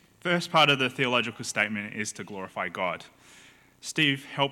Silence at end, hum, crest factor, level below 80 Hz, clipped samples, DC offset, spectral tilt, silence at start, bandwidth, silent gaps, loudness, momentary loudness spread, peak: 0 s; none; 20 dB; -72 dBFS; under 0.1%; under 0.1%; -3.5 dB/octave; 0.25 s; 17 kHz; none; -26 LUFS; 14 LU; -8 dBFS